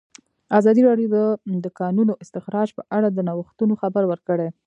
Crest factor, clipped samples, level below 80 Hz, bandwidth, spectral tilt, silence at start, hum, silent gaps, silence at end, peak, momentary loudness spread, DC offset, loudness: 18 dB; under 0.1%; -72 dBFS; 8.2 kHz; -9 dB/octave; 0.5 s; none; none; 0.15 s; -2 dBFS; 9 LU; under 0.1%; -21 LUFS